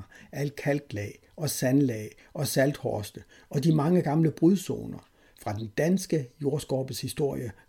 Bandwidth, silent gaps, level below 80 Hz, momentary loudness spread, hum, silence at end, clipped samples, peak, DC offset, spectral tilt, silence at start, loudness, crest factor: 17 kHz; none; -60 dBFS; 14 LU; none; 0.15 s; under 0.1%; -12 dBFS; under 0.1%; -6 dB/octave; 0 s; -28 LUFS; 16 dB